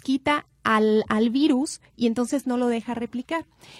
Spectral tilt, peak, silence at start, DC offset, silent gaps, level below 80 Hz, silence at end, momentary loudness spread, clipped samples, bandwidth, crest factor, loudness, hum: -4.5 dB/octave; -8 dBFS; 0.05 s; under 0.1%; none; -60 dBFS; 0 s; 10 LU; under 0.1%; 13 kHz; 16 dB; -24 LUFS; none